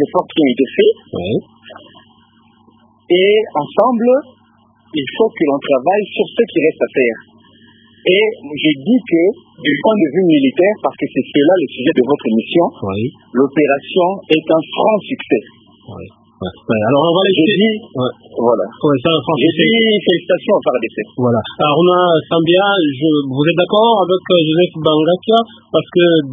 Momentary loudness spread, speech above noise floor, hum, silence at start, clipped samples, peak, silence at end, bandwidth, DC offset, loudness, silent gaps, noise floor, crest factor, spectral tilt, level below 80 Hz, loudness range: 8 LU; 38 dB; none; 0 s; under 0.1%; 0 dBFS; 0 s; 3.9 kHz; under 0.1%; -14 LUFS; none; -52 dBFS; 14 dB; -9 dB/octave; -54 dBFS; 4 LU